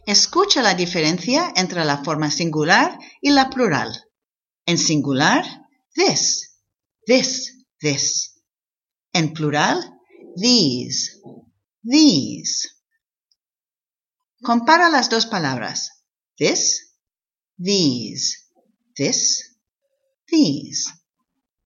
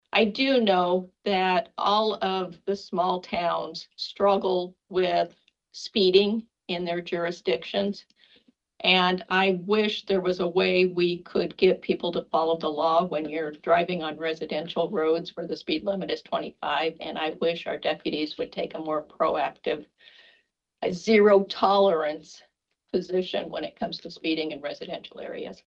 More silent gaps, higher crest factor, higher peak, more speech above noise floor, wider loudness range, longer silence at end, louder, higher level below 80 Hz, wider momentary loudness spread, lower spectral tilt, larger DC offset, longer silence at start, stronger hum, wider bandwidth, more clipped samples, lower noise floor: neither; about the same, 20 dB vs 22 dB; first, 0 dBFS vs -4 dBFS; first, over 72 dB vs 42 dB; about the same, 4 LU vs 5 LU; first, 0.75 s vs 0.15 s; first, -18 LUFS vs -26 LUFS; about the same, -62 dBFS vs -64 dBFS; about the same, 13 LU vs 12 LU; second, -3 dB/octave vs -5.5 dB/octave; neither; about the same, 0.05 s vs 0.15 s; neither; about the same, 7.6 kHz vs 7.6 kHz; neither; first, under -90 dBFS vs -68 dBFS